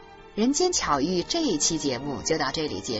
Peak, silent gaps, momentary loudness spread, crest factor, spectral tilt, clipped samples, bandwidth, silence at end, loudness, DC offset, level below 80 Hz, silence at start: -10 dBFS; none; 6 LU; 16 dB; -3 dB/octave; under 0.1%; 8.2 kHz; 0 s; -25 LUFS; under 0.1%; -48 dBFS; 0 s